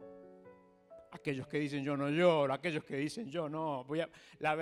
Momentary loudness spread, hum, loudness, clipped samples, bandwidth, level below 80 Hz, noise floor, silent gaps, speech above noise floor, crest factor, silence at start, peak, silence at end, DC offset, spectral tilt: 14 LU; none; -35 LUFS; under 0.1%; 12 kHz; -76 dBFS; -60 dBFS; none; 25 dB; 20 dB; 0 s; -16 dBFS; 0 s; under 0.1%; -6.5 dB/octave